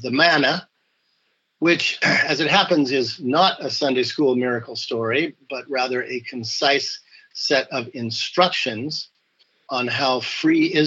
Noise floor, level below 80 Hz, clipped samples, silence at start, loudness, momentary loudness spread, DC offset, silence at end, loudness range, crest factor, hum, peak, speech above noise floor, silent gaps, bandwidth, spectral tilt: -69 dBFS; -72 dBFS; under 0.1%; 0 s; -20 LUFS; 11 LU; under 0.1%; 0 s; 4 LU; 18 dB; none; -4 dBFS; 48 dB; none; 8 kHz; -4 dB/octave